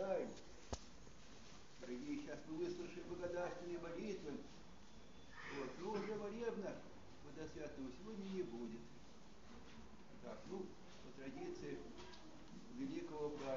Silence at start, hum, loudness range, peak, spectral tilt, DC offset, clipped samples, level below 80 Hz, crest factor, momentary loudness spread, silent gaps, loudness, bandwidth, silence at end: 0 s; none; 5 LU; -28 dBFS; -5 dB/octave; 0.1%; under 0.1%; -68 dBFS; 22 dB; 15 LU; none; -50 LUFS; 7.4 kHz; 0 s